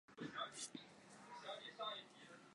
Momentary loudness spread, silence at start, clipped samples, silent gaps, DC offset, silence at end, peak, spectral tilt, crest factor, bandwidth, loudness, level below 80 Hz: 13 LU; 0.1 s; under 0.1%; none; under 0.1%; 0 s; -34 dBFS; -2 dB/octave; 20 dB; 11.5 kHz; -51 LUFS; under -90 dBFS